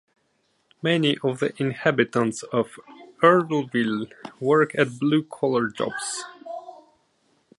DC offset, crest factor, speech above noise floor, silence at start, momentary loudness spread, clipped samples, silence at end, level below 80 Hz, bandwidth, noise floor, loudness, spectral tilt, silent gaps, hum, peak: under 0.1%; 22 dB; 46 dB; 0.85 s; 13 LU; under 0.1%; 0.85 s; -70 dBFS; 11.5 kHz; -69 dBFS; -23 LUFS; -5 dB/octave; none; none; -2 dBFS